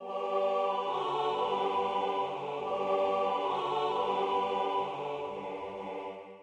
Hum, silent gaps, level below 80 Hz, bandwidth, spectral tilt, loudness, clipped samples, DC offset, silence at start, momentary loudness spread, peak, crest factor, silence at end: none; none; -74 dBFS; 9.8 kHz; -5 dB/octave; -32 LUFS; under 0.1%; under 0.1%; 0 s; 10 LU; -18 dBFS; 14 dB; 0 s